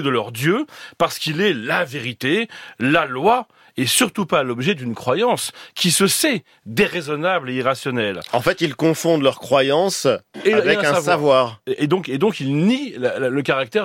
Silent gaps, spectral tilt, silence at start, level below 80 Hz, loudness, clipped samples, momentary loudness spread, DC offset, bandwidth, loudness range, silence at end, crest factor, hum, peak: none; -4 dB/octave; 0 s; -60 dBFS; -19 LUFS; under 0.1%; 7 LU; under 0.1%; 16.5 kHz; 2 LU; 0 s; 16 dB; none; -2 dBFS